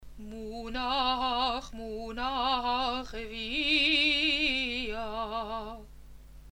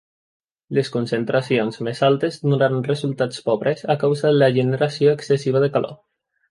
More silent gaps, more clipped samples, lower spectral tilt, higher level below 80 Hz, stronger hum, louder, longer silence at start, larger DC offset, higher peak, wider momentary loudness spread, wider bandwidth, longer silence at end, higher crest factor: neither; neither; second, -3 dB/octave vs -7 dB/octave; first, -48 dBFS vs -64 dBFS; neither; second, -29 LUFS vs -20 LUFS; second, 0 s vs 0.7 s; neither; second, -14 dBFS vs -4 dBFS; first, 17 LU vs 6 LU; first, 16.5 kHz vs 11.5 kHz; second, 0 s vs 0.55 s; about the same, 18 dB vs 16 dB